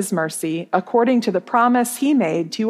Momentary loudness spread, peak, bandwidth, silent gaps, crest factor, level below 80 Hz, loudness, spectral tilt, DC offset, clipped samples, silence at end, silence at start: 6 LU; -4 dBFS; 15.5 kHz; none; 16 dB; -78 dBFS; -19 LUFS; -5 dB/octave; under 0.1%; under 0.1%; 0 s; 0 s